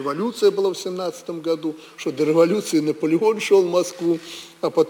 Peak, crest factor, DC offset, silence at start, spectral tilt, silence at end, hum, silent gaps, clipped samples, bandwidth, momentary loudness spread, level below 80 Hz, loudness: -4 dBFS; 16 dB; under 0.1%; 0 s; -5 dB/octave; 0 s; none; none; under 0.1%; 19.5 kHz; 12 LU; -72 dBFS; -21 LUFS